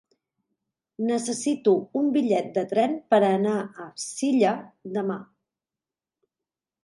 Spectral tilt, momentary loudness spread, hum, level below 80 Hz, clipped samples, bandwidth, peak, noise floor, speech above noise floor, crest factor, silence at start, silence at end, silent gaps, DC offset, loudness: -5 dB/octave; 12 LU; none; -78 dBFS; under 0.1%; 11.5 kHz; -8 dBFS; under -90 dBFS; over 66 dB; 18 dB; 1 s; 1.6 s; none; under 0.1%; -25 LUFS